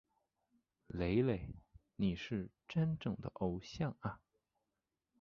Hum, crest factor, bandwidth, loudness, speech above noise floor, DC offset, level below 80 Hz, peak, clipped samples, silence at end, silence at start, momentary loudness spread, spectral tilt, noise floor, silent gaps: none; 20 dB; 7 kHz; -40 LUFS; 51 dB; under 0.1%; -58 dBFS; -22 dBFS; under 0.1%; 1.05 s; 0.9 s; 16 LU; -7 dB/octave; -90 dBFS; none